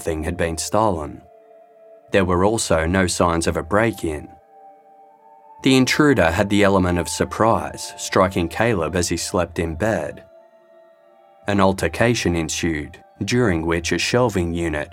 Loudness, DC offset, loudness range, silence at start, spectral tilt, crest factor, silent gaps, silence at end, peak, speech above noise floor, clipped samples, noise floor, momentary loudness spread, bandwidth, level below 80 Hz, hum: -20 LUFS; under 0.1%; 4 LU; 0 s; -5 dB/octave; 20 dB; none; 0 s; -2 dBFS; 32 dB; under 0.1%; -51 dBFS; 10 LU; 16.5 kHz; -44 dBFS; none